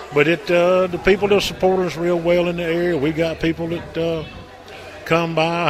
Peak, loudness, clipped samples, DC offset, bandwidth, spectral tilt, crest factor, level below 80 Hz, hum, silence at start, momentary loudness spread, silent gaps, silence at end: 0 dBFS; -19 LUFS; under 0.1%; under 0.1%; 15 kHz; -6 dB/octave; 18 dB; -42 dBFS; none; 0 s; 16 LU; none; 0 s